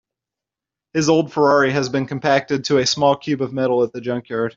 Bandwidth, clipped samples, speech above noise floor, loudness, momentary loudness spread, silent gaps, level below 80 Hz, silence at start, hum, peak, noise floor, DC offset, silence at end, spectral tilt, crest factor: 7.8 kHz; under 0.1%; 69 dB; -18 LUFS; 7 LU; none; -58 dBFS; 0.95 s; none; -2 dBFS; -87 dBFS; under 0.1%; 0.05 s; -5 dB/octave; 16 dB